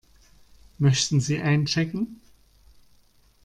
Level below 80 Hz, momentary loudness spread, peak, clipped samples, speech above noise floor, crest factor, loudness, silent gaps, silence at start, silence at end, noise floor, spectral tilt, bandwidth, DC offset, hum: -56 dBFS; 9 LU; -8 dBFS; under 0.1%; 36 dB; 18 dB; -24 LUFS; none; 0.8 s; 1.3 s; -59 dBFS; -5 dB/octave; 10.5 kHz; under 0.1%; none